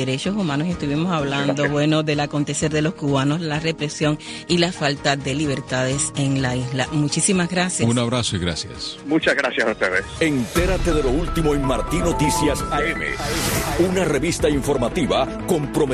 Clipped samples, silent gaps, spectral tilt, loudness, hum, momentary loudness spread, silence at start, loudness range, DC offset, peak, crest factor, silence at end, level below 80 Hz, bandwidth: under 0.1%; none; -4.5 dB/octave; -21 LUFS; none; 4 LU; 0 s; 1 LU; under 0.1%; -4 dBFS; 16 dB; 0 s; -34 dBFS; 14 kHz